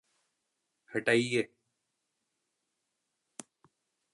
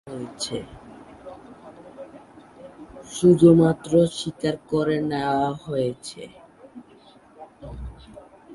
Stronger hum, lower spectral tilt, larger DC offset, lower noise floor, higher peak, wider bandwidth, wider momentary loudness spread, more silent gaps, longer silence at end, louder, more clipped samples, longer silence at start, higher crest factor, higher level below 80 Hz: neither; second, -4.5 dB/octave vs -6.5 dB/octave; neither; first, -83 dBFS vs -51 dBFS; second, -12 dBFS vs -4 dBFS; about the same, 11.5 kHz vs 11.5 kHz; second, 23 LU vs 28 LU; neither; first, 2.7 s vs 0 s; second, -31 LUFS vs -21 LUFS; neither; first, 0.9 s vs 0.05 s; about the same, 24 dB vs 20 dB; second, -82 dBFS vs -50 dBFS